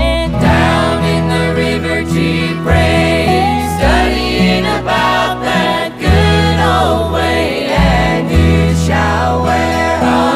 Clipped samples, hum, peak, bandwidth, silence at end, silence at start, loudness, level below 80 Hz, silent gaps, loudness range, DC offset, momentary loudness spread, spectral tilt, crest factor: under 0.1%; none; 0 dBFS; 15.5 kHz; 0 s; 0 s; -12 LUFS; -22 dBFS; none; 1 LU; under 0.1%; 3 LU; -6 dB/octave; 10 dB